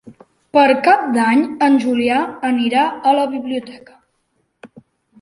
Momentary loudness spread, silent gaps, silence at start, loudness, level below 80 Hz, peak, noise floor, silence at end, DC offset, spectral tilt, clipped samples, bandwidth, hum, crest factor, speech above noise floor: 8 LU; none; 0.05 s; -15 LUFS; -62 dBFS; -2 dBFS; -67 dBFS; 0.55 s; under 0.1%; -4.5 dB/octave; under 0.1%; 11.5 kHz; none; 16 dB; 51 dB